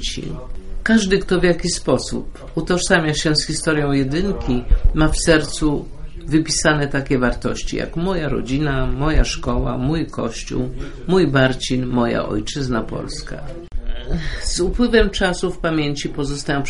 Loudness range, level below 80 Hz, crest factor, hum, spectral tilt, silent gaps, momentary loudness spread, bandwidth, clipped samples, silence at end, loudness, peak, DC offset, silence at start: 4 LU; -26 dBFS; 18 dB; none; -5 dB/octave; none; 12 LU; 11.5 kHz; under 0.1%; 0 s; -19 LUFS; 0 dBFS; under 0.1%; 0 s